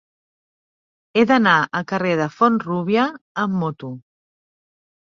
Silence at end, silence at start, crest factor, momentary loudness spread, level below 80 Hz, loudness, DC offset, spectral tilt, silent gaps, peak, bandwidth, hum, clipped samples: 1.05 s; 1.15 s; 20 dB; 12 LU; -64 dBFS; -19 LUFS; under 0.1%; -6.5 dB/octave; 3.21-3.35 s; -2 dBFS; 7.2 kHz; none; under 0.1%